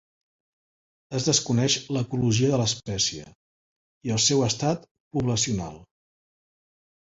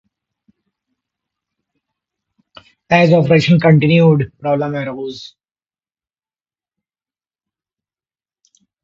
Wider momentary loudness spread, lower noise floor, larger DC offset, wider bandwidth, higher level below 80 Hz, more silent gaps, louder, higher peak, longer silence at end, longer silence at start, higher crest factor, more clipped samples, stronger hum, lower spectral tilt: second, 12 LU vs 15 LU; about the same, under -90 dBFS vs under -90 dBFS; neither; about the same, 8 kHz vs 7.4 kHz; about the same, -54 dBFS vs -54 dBFS; first, 3.35-4.01 s, 4.91-5.11 s vs none; second, -24 LUFS vs -13 LUFS; second, -8 dBFS vs 0 dBFS; second, 1.3 s vs 3.55 s; second, 1.1 s vs 2.9 s; about the same, 20 dB vs 18 dB; neither; neither; second, -4 dB/octave vs -8 dB/octave